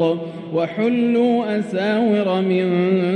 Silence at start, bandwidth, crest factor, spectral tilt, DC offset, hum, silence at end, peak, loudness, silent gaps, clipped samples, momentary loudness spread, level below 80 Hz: 0 s; 9.2 kHz; 12 dB; -8 dB/octave; under 0.1%; none; 0 s; -8 dBFS; -19 LUFS; none; under 0.1%; 6 LU; -68 dBFS